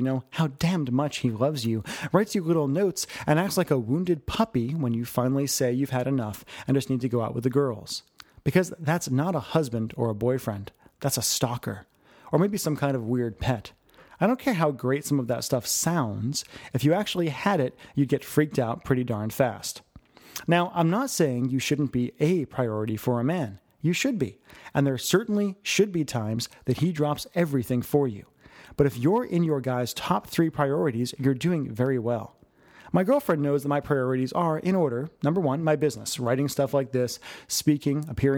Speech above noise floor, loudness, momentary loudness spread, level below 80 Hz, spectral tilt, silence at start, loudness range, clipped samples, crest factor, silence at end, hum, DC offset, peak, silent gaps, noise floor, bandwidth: 29 dB; -26 LUFS; 6 LU; -56 dBFS; -5.5 dB/octave; 0 s; 2 LU; under 0.1%; 20 dB; 0 s; none; under 0.1%; -6 dBFS; none; -54 dBFS; over 20 kHz